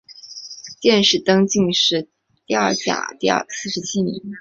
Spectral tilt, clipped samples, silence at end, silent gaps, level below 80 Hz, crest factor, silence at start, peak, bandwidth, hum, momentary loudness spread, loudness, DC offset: -3.5 dB/octave; under 0.1%; 0 s; none; -58 dBFS; 18 dB; 0.1 s; -2 dBFS; 8 kHz; none; 18 LU; -18 LUFS; under 0.1%